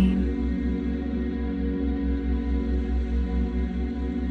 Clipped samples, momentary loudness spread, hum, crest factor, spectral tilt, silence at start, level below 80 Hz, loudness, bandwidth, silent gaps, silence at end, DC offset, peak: under 0.1%; 2 LU; none; 14 dB; -9.5 dB/octave; 0 s; -28 dBFS; -27 LUFS; 4.7 kHz; none; 0 s; under 0.1%; -10 dBFS